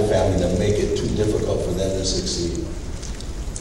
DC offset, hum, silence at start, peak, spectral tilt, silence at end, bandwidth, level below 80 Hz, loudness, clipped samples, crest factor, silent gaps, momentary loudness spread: under 0.1%; none; 0 s; -6 dBFS; -5 dB/octave; 0 s; 13 kHz; -30 dBFS; -23 LUFS; under 0.1%; 16 dB; none; 12 LU